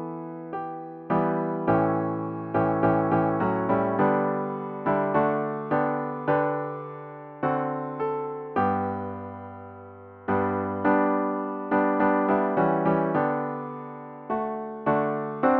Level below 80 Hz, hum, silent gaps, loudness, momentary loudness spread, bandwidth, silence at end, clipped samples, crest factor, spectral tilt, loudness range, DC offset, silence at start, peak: -60 dBFS; none; none; -26 LUFS; 14 LU; 4.5 kHz; 0 s; under 0.1%; 18 dB; -11 dB/octave; 5 LU; under 0.1%; 0 s; -8 dBFS